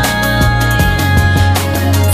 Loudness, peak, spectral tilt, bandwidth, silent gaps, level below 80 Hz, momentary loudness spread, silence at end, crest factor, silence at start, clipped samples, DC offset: -12 LUFS; 0 dBFS; -5 dB/octave; 16 kHz; none; -20 dBFS; 2 LU; 0 s; 10 dB; 0 s; under 0.1%; under 0.1%